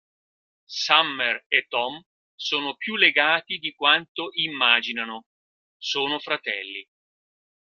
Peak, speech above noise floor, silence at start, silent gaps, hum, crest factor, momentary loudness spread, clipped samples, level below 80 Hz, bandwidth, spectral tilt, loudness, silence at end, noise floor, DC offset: -2 dBFS; over 66 dB; 0.7 s; 1.46-1.50 s, 2.06-2.38 s, 4.09-4.15 s, 5.26-5.80 s; none; 24 dB; 15 LU; under 0.1%; -78 dBFS; 14 kHz; -1.5 dB/octave; -22 LUFS; 1 s; under -90 dBFS; under 0.1%